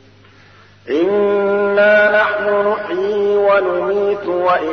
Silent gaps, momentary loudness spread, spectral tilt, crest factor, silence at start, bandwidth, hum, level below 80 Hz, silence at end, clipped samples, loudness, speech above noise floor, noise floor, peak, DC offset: none; 7 LU; -6.5 dB/octave; 12 dB; 0.85 s; 6.4 kHz; 50 Hz at -45 dBFS; -60 dBFS; 0 s; under 0.1%; -15 LUFS; 30 dB; -45 dBFS; -2 dBFS; 0.2%